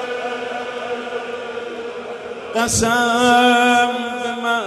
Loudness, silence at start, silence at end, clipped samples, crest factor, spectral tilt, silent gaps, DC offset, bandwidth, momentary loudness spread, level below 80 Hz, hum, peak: -18 LUFS; 0 s; 0 s; under 0.1%; 16 dB; -2.5 dB/octave; none; under 0.1%; 13.5 kHz; 16 LU; -48 dBFS; none; -2 dBFS